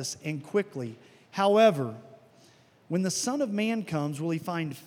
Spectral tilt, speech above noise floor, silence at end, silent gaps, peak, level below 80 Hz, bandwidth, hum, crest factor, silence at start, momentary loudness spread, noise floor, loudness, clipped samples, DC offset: -5 dB/octave; 31 dB; 0 s; none; -8 dBFS; -80 dBFS; 17.5 kHz; none; 20 dB; 0 s; 16 LU; -59 dBFS; -28 LUFS; under 0.1%; under 0.1%